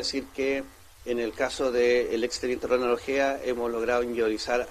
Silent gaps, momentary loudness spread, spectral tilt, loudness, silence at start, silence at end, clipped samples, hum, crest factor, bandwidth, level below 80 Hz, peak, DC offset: none; 7 LU; -3.5 dB/octave; -27 LUFS; 0 s; 0 s; under 0.1%; none; 16 dB; 14.5 kHz; -52 dBFS; -12 dBFS; under 0.1%